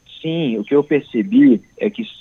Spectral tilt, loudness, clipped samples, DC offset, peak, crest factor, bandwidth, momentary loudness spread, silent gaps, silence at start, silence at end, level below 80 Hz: -8.5 dB/octave; -17 LUFS; under 0.1%; under 0.1%; -4 dBFS; 14 dB; 6.2 kHz; 11 LU; none; 0.1 s; 0.1 s; -62 dBFS